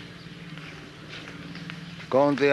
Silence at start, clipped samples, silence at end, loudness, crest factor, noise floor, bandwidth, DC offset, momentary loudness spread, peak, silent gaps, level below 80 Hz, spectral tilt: 0 s; under 0.1%; 0 s; -28 LUFS; 20 dB; -42 dBFS; 12 kHz; under 0.1%; 19 LU; -8 dBFS; none; -60 dBFS; -6 dB/octave